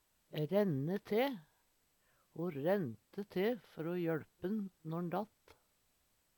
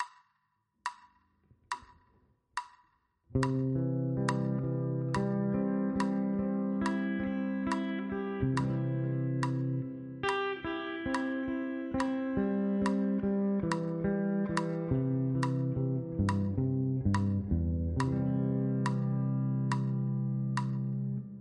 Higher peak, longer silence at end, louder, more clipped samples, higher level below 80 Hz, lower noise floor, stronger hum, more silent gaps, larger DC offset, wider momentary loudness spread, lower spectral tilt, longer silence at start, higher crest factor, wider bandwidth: second, -22 dBFS vs -14 dBFS; first, 1.1 s vs 0 s; second, -39 LUFS vs -33 LUFS; neither; second, -80 dBFS vs -52 dBFS; about the same, -77 dBFS vs -78 dBFS; neither; neither; neither; first, 11 LU vs 5 LU; about the same, -8 dB/octave vs -7.5 dB/octave; first, 0.3 s vs 0 s; about the same, 18 dB vs 18 dB; first, 19 kHz vs 10.5 kHz